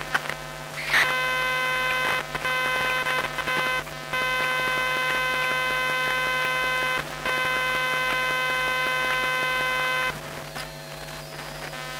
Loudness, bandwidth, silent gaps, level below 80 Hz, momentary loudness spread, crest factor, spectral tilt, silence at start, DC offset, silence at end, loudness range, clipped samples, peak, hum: -24 LUFS; 16 kHz; none; -52 dBFS; 11 LU; 16 dB; -2 dB/octave; 0 s; under 0.1%; 0 s; 1 LU; under 0.1%; -10 dBFS; none